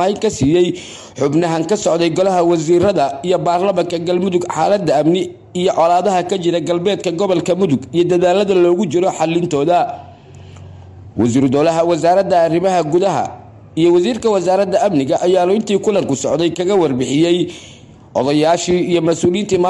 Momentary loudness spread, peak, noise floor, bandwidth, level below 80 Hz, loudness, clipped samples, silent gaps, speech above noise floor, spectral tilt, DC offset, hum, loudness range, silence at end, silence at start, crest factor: 5 LU; -4 dBFS; -37 dBFS; 11.5 kHz; -50 dBFS; -15 LUFS; under 0.1%; none; 23 dB; -5.5 dB/octave; under 0.1%; none; 2 LU; 0 s; 0 s; 10 dB